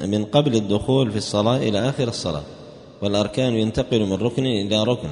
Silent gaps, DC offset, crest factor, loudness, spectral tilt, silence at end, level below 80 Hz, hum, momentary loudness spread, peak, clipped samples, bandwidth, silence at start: none; under 0.1%; 18 dB; -21 LUFS; -6 dB/octave; 0 s; -48 dBFS; none; 8 LU; -4 dBFS; under 0.1%; 10.5 kHz; 0 s